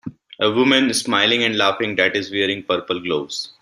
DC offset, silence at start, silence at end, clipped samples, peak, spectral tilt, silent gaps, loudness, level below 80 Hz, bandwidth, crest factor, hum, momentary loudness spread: under 0.1%; 0.05 s; 0.1 s; under 0.1%; -2 dBFS; -3 dB/octave; none; -18 LUFS; -62 dBFS; 13.5 kHz; 18 dB; none; 8 LU